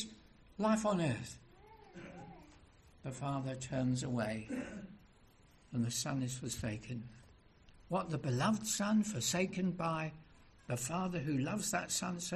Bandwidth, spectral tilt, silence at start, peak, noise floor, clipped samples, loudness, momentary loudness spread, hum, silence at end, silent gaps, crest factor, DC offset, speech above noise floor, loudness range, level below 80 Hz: 13.5 kHz; -4.5 dB/octave; 0 s; -20 dBFS; -64 dBFS; under 0.1%; -37 LUFS; 19 LU; none; 0 s; none; 18 dB; under 0.1%; 28 dB; 5 LU; -64 dBFS